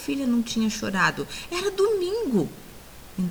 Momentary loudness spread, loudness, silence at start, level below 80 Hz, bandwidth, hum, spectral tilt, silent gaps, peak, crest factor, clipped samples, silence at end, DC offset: 16 LU; -25 LUFS; 0 s; -50 dBFS; over 20 kHz; none; -4.5 dB/octave; none; -8 dBFS; 18 dB; under 0.1%; 0 s; under 0.1%